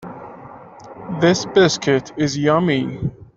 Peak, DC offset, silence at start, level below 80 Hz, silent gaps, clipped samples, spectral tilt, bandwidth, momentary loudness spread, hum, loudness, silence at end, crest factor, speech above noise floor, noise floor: -2 dBFS; under 0.1%; 0 s; -50 dBFS; none; under 0.1%; -5 dB/octave; 7.8 kHz; 21 LU; none; -18 LUFS; 0.15 s; 16 dB; 22 dB; -39 dBFS